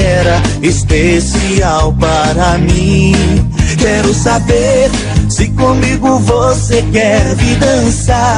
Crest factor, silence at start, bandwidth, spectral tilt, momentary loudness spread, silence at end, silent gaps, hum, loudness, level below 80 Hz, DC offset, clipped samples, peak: 10 dB; 0 s; 11 kHz; -5.5 dB/octave; 2 LU; 0 s; none; none; -10 LUFS; -18 dBFS; under 0.1%; 0.2%; 0 dBFS